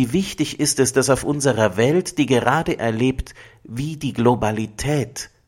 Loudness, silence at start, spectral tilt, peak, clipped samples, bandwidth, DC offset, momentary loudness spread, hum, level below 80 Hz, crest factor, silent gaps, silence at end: -20 LUFS; 0 s; -5 dB/octave; -2 dBFS; under 0.1%; 16.5 kHz; under 0.1%; 11 LU; none; -40 dBFS; 18 dB; none; 0.2 s